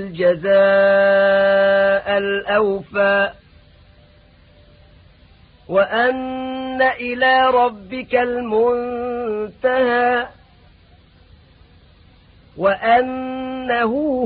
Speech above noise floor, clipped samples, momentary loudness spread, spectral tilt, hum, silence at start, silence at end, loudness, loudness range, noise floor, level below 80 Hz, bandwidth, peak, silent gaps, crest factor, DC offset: 33 dB; under 0.1%; 11 LU; -10 dB/octave; none; 0 s; 0 s; -17 LUFS; 8 LU; -49 dBFS; -52 dBFS; 4.8 kHz; -4 dBFS; none; 14 dB; under 0.1%